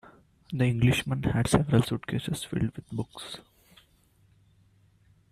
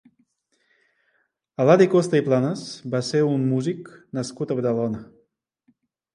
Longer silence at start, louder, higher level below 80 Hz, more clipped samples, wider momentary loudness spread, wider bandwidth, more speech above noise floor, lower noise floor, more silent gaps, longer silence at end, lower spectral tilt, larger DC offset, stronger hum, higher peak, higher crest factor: second, 0.5 s vs 1.6 s; second, -28 LUFS vs -22 LUFS; first, -50 dBFS vs -66 dBFS; neither; about the same, 15 LU vs 16 LU; first, 14.5 kHz vs 11 kHz; second, 36 dB vs 48 dB; second, -64 dBFS vs -70 dBFS; neither; first, 1.9 s vs 1.1 s; about the same, -6 dB/octave vs -6.5 dB/octave; neither; neither; second, -6 dBFS vs -2 dBFS; about the same, 24 dB vs 22 dB